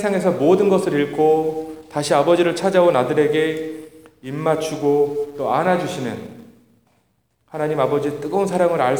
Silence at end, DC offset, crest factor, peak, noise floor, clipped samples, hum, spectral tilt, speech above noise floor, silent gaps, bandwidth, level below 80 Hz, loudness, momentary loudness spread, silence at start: 0 s; 0.1%; 16 dB; -2 dBFS; -65 dBFS; under 0.1%; none; -6 dB/octave; 47 dB; none; over 20 kHz; -62 dBFS; -19 LUFS; 14 LU; 0 s